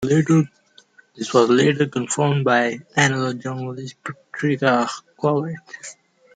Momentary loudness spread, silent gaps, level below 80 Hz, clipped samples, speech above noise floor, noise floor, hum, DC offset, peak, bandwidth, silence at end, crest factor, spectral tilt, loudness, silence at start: 16 LU; none; -62 dBFS; under 0.1%; 33 dB; -53 dBFS; none; under 0.1%; -4 dBFS; 9.6 kHz; 0.45 s; 18 dB; -5.5 dB/octave; -20 LUFS; 0 s